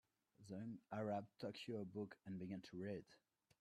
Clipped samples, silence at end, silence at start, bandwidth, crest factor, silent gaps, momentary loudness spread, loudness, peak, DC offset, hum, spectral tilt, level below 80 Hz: under 0.1%; 0.45 s; 0.4 s; 13 kHz; 18 dB; none; 7 LU; -51 LUFS; -34 dBFS; under 0.1%; none; -7 dB/octave; -86 dBFS